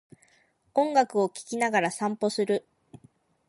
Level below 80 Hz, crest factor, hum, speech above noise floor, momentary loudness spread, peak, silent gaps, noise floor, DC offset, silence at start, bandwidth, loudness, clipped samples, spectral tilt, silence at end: -76 dBFS; 18 dB; none; 40 dB; 6 LU; -10 dBFS; none; -66 dBFS; under 0.1%; 0.75 s; 11.5 kHz; -27 LUFS; under 0.1%; -4.5 dB/octave; 0.9 s